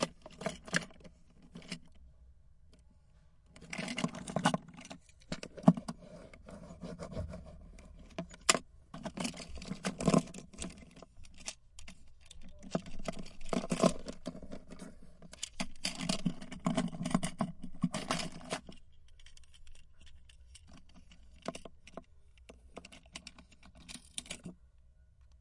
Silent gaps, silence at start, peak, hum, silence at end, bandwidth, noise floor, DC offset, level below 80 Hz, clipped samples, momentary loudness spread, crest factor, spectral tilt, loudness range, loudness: none; 0 s; -6 dBFS; none; 0.05 s; 11.5 kHz; -62 dBFS; under 0.1%; -54 dBFS; under 0.1%; 25 LU; 32 dB; -4.5 dB/octave; 16 LU; -37 LUFS